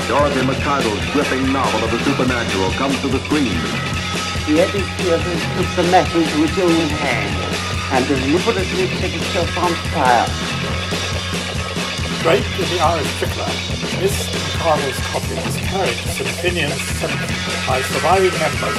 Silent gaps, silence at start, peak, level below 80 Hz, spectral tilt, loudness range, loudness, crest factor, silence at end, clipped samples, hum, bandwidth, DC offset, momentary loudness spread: none; 0 s; 0 dBFS; -34 dBFS; -4.5 dB/octave; 3 LU; -18 LUFS; 18 dB; 0 s; under 0.1%; none; 16 kHz; under 0.1%; 6 LU